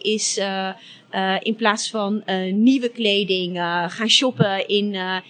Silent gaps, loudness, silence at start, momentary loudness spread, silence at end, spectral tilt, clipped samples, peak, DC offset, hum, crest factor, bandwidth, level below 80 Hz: none; -20 LUFS; 0.05 s; 8 LU; 0.1 s; -3.5 dB/octave; under 0.1%; -2 dBFS; under 0.1%; none; 18 dB; 9.6 kHz; under -90 dBFS